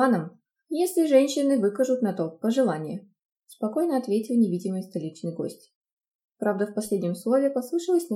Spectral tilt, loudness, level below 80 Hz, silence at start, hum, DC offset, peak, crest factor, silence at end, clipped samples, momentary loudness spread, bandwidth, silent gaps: -6 dB/octave; -25 LUFS; -78 dBFS; 0 s; none; under 0.1%; -8 dBFS; 18 dB; 0 s; under 0.1%; 12 LU; 17 kHz; 3.25-3.36 s, 5.75-5.82 s, 5.93-5.97 s, 6.11-6.19 s